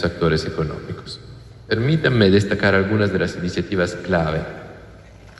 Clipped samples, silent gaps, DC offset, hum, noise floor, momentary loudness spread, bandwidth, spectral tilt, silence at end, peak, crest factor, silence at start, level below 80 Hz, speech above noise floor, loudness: under 0.1%; none; under 0.1%; none; -42 dBFS; 17 LU; 11.5 kHz; -6.5 dB/octave; 0.05 s; -2 dBFS; 18 dB; 0 s; -42 dBFS; 23 dB; -19 LUFS